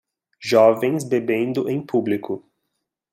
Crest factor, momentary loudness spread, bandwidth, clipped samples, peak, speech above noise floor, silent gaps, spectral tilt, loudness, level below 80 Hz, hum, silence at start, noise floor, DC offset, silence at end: 18 dB; 15 LU; 16 kHz; under 0.1%; -2 dBFS; 58 dB; none; -6 dB/octave; -20 LUFS; -70 dBFS; none; 0.4 s; -78 dBFS; under 0.1%; 0.75 s